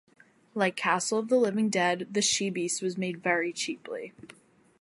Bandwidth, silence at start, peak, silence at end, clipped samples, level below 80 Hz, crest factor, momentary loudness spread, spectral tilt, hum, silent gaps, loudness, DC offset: 11.5 kHz; 0.55 s; -10 dBFS; 0.55 s; under 0.1%; -76 dBFS; 20 dB; 12 LU; -3 dB/octave; none; none; -28 LUFS; under 0.1%